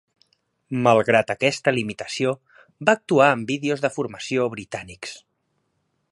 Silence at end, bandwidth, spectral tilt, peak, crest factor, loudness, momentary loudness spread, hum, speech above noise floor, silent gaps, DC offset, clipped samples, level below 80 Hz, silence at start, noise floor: 0.95 s; 11.5 kHz; -5 dB/octave; 0 dBFS; 22 dB; -21 LUFS; 16 LU; none; 51 dB; none; under 0.1%; under 0.1%; -62 dBFS; 0.7 s; -72 dBFS